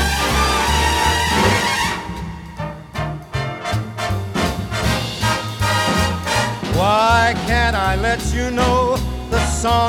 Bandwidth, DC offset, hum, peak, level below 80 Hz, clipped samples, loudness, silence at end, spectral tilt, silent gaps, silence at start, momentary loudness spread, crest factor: 18 kHz; under 0.1%; none; -2 dBFS; -28 dBFS; under 0.1%; -18 LUFS; 0 s; -4 dB/octave; none; 0 s; 11 LU; 16 dB